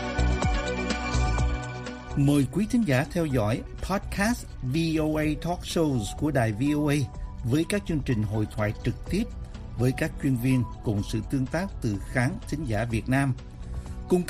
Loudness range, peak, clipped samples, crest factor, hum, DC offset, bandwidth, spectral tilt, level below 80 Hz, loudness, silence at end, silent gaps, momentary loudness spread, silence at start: 2 LU; -8 dBFS; under 0.1%; 20 dB; none; under 0.1%; 15.5 kHz; -6.5 dB/octave; -36 dBFS; -27 LUFS; 0 s; none; 8 LU; 0 s